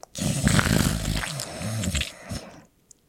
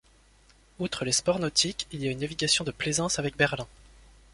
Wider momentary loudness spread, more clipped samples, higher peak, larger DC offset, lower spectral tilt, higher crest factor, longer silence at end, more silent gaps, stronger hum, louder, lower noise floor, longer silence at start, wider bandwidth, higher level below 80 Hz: first, 14 LU vs 9 LU; neither; first, -2 dBFS vs -8 dBFS; neither; about the same, -4 dB/octave vs -3 dB/octave; about the same, 24 dB vs 22 dB; about the same, 0.5 s vs 0.5 s; neither; neither; about the same, -25 LUFS vs -27 LUFS; second, -55 dBFS vs -59 dBFS; second, 0.15 s vs 0.8 s; first, 16.5 kHz vs 11.5 kHz; first, -36 dBFS vs -54 dBFS